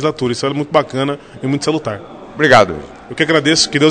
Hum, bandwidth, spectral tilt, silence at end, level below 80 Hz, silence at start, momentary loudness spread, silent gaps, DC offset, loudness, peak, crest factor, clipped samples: none; 11 kHz; -4 dB/octave; 0 s; -46 dBFS; 0 s; 17 LU; none; under 0.1%; -14 LUFS; 0 dBFS; 14 dB; 0.3%